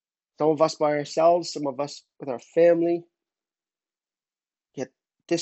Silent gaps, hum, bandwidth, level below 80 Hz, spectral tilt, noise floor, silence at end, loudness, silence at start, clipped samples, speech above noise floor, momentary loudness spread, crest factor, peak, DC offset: none; none; 8.2 kHz; -80 dBFS; -5 dB/octave; under -90 dBFS; 0 s; -24 LUFS; 0.4 s; under 0.1%; over 67 dB; 17 LU; 20 dB; -6 dBFS; under 0.1%